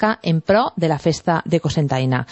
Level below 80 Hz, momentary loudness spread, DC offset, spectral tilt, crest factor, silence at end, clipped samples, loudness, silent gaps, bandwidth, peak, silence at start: -48 dBFS; 3 LU; under 0.1%; -6.5 dB/octave; 14 dB; 0.05 s; under 0.1%; -19 LUFS; none; 8.4 kHz; -4 dBFS; 0 s